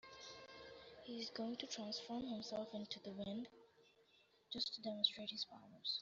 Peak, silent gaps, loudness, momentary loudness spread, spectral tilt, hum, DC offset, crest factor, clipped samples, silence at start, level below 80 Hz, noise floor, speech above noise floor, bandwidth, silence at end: -20 dBFS; none; -45 LUFS; 18 LU; -2 dB/octave; none; under 0.1%; 28 dB; under 0.1%; 0.05 s; -82 dBFS; -74 dBFS; 28 dB; 7.6 kHz; 0 s